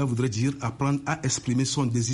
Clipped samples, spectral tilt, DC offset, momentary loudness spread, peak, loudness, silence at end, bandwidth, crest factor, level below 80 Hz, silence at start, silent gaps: under 0.1%; -5 dB/octave; under 0.1%; 2 LU; -14 dBFS; -26 LUFS; 0 s; 11.5 kHz; 12 dB; -56 dBFS; 0 s; none